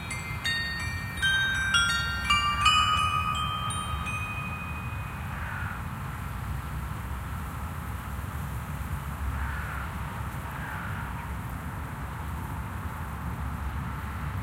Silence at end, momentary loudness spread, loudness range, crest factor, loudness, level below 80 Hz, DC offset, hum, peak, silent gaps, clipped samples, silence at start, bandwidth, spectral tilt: 0 s; 12 LU; 11 LU; 22 dB; -30 LUFS; -38 dBFS; under 0.1%; none; -8 dBFS; none; under 0.1%; 0 s; 16 kHz; -3.5 dB/octave